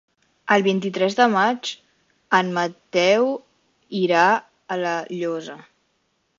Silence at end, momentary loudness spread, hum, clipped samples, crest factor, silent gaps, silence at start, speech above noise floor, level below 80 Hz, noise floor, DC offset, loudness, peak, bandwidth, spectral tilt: 0.8 s; 14 LU; none; under 0.1%; 20 dB; none; 0.45 s; 49 dB; -68 dBFS; -69 dBFS; under 0.1%; -21 LUFS; -2 dBFS; 7.6 kHz; -4.5 dB/octave